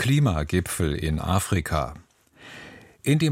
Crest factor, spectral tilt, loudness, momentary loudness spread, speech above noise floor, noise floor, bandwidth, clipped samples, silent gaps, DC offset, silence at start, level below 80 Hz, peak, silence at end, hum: 18 dB; -5.5 dB/octave; -25 LUFS; 20 LU; 26 dB; -49 dBFS; 16 kHz; under 0.1%; none; under 0.1%; 0 s; -38 dBFS; -6 dBFS; 0 s; none